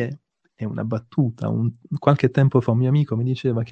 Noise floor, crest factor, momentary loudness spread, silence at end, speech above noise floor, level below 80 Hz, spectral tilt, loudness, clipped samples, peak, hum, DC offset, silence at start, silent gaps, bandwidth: -40 dBFS; 20 dB; 11 LU; 0 s; 20 dB; -60 dBFS; -9.5 dB/octave; -21 LUFS; under 0.1%; -2 dBFS; none; under 0.1%; 0 s; none; 6.2 kHz